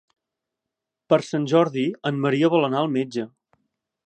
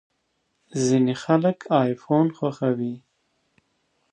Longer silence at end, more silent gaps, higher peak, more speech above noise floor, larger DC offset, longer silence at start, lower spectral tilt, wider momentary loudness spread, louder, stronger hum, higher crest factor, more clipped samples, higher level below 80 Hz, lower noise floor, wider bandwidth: second, 0.8 s vs 1.15 s; neither; about the same, -4 dBFS vs -4 dBFS; first, 64 dB vs 51 dB; neither; first, 1.1 s vs 0.75 s; about the same, -6.5 dB/octave vs -6.5 dB/octave; about the same, 9 LU vs 9 LU; about the same, -22 LUFS vs -23 LUFS; neither; about the same, 20 dB vs 20 dB; neither; second, -76 dBFS vs -70 dBFS; first, -85 dBFS vs -72 dBFS; about the same, 9 kHz vs 9.8 kHz